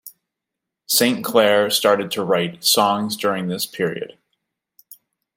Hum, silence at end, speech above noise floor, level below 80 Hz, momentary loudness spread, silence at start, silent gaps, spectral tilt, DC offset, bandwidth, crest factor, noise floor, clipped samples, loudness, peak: none; 1.3 s; 64 dB; -70 dBFS; 9 LU; 0.05 s; none; -3 dB/octave; under 0.1%; 16.5 kHz; 18 dB; -83 dBFS; under 0.1%; -18 LUFS; -2 dBFS